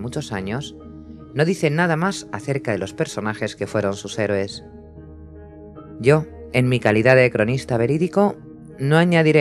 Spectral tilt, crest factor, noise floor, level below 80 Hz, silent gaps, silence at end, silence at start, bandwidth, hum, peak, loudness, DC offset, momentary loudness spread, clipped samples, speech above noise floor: -6.5 dB/octave; 20 dB; -40 dBFS; -50 dBFS; none; 0 s; 0 s; 12.5 kHz; none; 0 dBFS; -20 LUFS; under 0.1%; 22 LU; under 0.1%; 21 dB